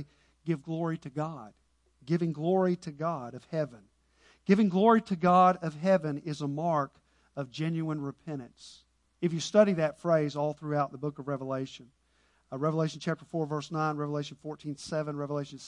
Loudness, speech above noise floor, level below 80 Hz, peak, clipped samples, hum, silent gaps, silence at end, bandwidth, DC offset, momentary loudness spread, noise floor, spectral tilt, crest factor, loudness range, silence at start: -30 LUFS; 40 dB; -70 dBFS; -10 dBFS; under 0.1%; none; none; 0 s; 10.5 kHz; under 0.1%; 16 LU; -69 dBFS; -7 dB/octave; 22 dB; 7 LU; 0 s